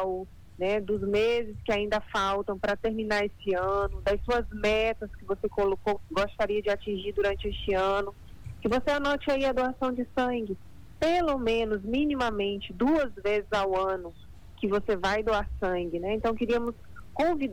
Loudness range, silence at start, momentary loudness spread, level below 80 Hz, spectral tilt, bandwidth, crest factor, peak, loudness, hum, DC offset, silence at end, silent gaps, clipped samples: 1 LU; 0 s; 7 LU; -44 dBFS; -5.5 dB/octave; 19 kHz; 12 dB; -16 dBFS; -29 LUFS; none; under 0.1%; 0 s; none; under 0.1%